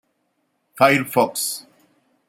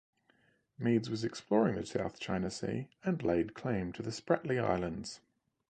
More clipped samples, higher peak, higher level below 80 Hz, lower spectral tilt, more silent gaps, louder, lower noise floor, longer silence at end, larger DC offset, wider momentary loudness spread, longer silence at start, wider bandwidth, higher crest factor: neither; first, -2 dBFS vs -14 dBFS; second, -70 dBFS vs -60 dBFS; second, -3.5 dB/octave vs -6.5 dB/octave; neither; first, -19 LUFS vs -35 LUFS; about the same, -70 dBFS vs -71 dBFS; first, 0.7 s vs 0.55 s; neither; about the same, 10 LU vs 9 LU; about the same, 0.75 s vs 0.8 s; first, 16.5 kHz vs 9.6 kHz; about the same, 20 dB vs 20 dB